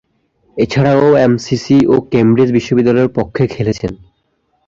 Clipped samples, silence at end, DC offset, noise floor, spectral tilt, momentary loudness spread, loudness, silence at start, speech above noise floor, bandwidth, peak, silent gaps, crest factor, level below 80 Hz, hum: under 0.1%; 0.7 s; under 0.1%; -62 dBFS; -7.5 dB/octave; 8 LU; -12 LUFS; 0.55 s; 51 dB; 7.6 kHz; 0 dBFS; none; 12 dB; -42 dBFS; none